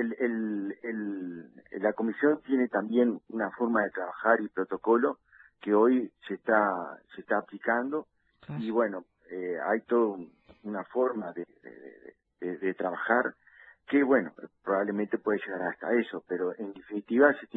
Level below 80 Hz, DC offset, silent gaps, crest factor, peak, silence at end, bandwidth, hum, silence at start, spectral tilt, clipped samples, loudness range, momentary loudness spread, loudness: -74 dBFS; under 0.1%; none; 22 dB; -6 dBFS; 0.1 s; 4.1 kHz; none; 0 s; -10 dB/octave; under 0.1%; 5 LU; 16 LU; -29 LUFS